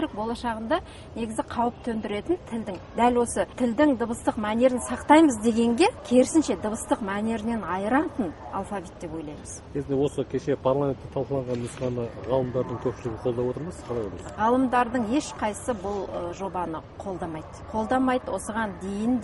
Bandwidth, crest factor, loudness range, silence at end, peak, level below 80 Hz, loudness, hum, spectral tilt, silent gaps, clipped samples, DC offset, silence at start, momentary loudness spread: 11.5 kHz; 20 dB; 7 LU; 0 s; -4 dBFS; -48 dBFS; -26 LUFS; none; -5.5 dB/octave; none; under 0.1%; under 0.1%; 0 s; 12 LU